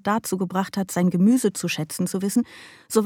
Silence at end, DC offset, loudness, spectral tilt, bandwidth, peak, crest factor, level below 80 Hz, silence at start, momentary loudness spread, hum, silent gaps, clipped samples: 0 s; under 0.1%; -23 LUFS; -5.5 dB/octave; 17.5 kHz; -6 dBFS; 18 dB; -64 dBFS; 0.05 s; 8 LU; none; none; under 0.1%